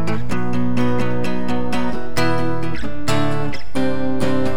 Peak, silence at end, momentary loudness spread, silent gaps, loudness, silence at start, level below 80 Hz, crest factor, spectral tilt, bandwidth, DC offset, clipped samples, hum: -6 dBFS; 0 s; 5 LU; none; -22 LUFS; 0 s; -38 dBFS; 16 dB; -6.5 dB/octave; over 20 kHz; 20%; under 0.1%; none